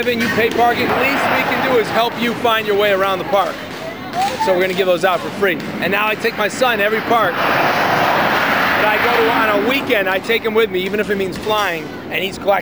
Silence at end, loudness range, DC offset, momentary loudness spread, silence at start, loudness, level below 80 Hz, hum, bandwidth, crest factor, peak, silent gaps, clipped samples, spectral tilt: 0 s; 3 LU; 0.3%; 6 LU; 0 s; -16 LUFS; -50 dBFS; none; over 20 kHz; 14 dB; -2 dBFS; none; under 0.1%; -4 dB/octave